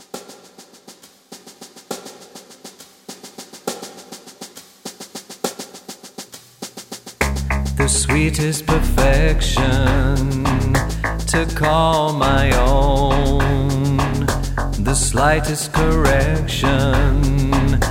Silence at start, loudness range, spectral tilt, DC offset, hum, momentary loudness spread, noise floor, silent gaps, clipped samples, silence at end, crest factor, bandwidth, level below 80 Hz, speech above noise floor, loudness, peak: 0.15 s; 17 LU; -5 dB/octave; under 0.1%; none; 20 LU; -45 dBFS; none; under 0.1%; 0 s; 16 dB; 16.5 kHz; -22 dBFS; 30 dB; -18 LUFS; -2 dBFS